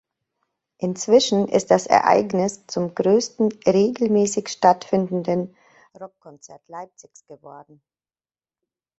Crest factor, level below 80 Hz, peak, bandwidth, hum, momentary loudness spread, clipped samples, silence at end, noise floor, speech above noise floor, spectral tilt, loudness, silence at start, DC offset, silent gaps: 20 dB; -64 dBFS; -2 dBFS; 8.4 kHz; none; 22 LU; under 0.1%; 1.4 s; under -90 dBFS; over 69 dB; -5 dB/octave; -20 LUFS; 0.8 s; under 0.1%; none